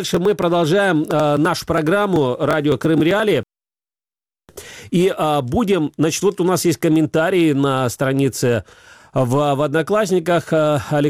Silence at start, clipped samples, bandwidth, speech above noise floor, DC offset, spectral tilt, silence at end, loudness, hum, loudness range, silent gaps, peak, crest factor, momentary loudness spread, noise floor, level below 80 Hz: 0 s; under 0.1%; 16 kHz; over 73 dB; under 0.1%; -5.5 dB/octave; 0 s; -17 LUFS; none; 3 LU; none; -6 dBFS; 12 dB; 3 LU; under -90 dBFS; -48 dBFS